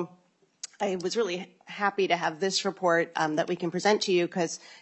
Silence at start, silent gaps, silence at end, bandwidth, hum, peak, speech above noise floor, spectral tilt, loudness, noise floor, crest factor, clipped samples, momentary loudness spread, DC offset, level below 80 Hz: 0 s; none; 0 s; 8.4 kHz; none; -10 dBFS; 36 dB; -4 dB/octave; -28 LUFS; -63 dBFS; 20 dB; under 0.1%; 11 LU; under 0.1%; -80 dBFS